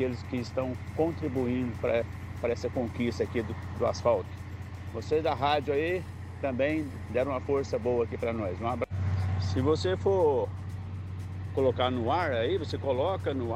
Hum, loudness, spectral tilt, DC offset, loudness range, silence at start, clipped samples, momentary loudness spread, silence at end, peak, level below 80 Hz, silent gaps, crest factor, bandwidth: none; -30 LUFS; -7 dB/octave; under 0.1%; 2 LU; 0 s; under 0.1%; 11 LU; 0 s; -14 dBFS; -52 dBFS; none; 16 dB; 10.5 kHz